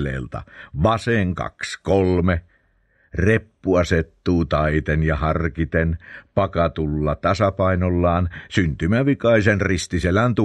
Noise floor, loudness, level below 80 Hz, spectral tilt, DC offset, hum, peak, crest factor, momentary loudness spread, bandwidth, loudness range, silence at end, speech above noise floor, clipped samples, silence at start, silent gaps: -61 dBFS; -20 LUFS; -34 dBFS; -7 dB/octave; under 0.1%; none; 0 dBFS; 20 dB; 8 LU; 10 kHz; 2 LU; 0 s; 41 dB; under 0.1%; 0 s; none